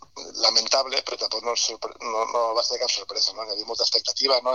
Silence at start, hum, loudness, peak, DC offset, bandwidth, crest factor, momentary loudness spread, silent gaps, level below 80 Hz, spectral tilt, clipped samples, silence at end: 0.15 s; none; -23 LUFS; -4 dBFS; 0.1%; 11.5 kHz; 20 dB; 9 LU; none; -66 dBFS; 1 dB/octave; under 0.1%; 0 s